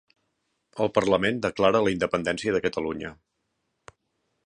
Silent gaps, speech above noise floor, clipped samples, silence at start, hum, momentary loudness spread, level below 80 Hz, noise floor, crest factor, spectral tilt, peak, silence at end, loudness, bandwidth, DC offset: none; 53 dB; under 0.1%; 0.75 s; none; 12 LU; -56 dBFS; -77 dBFS; 22 dB; -5.5 dB/octave; -6 dBFS; 1.35 s; -25 LUFS; 10.5 kHz; under 0.1%